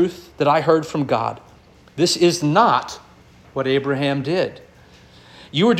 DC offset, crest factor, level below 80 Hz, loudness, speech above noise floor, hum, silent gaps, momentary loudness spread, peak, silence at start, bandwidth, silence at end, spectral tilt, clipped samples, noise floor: under 0.1%; 18 dB; -56 dBFS; -19 LUFS; 29 dB; none; none; 15 LU; -2 dBFS; 0 s; 15 kHz; 0 s; -5 dB/octave; under 0.1%; -48 dBFS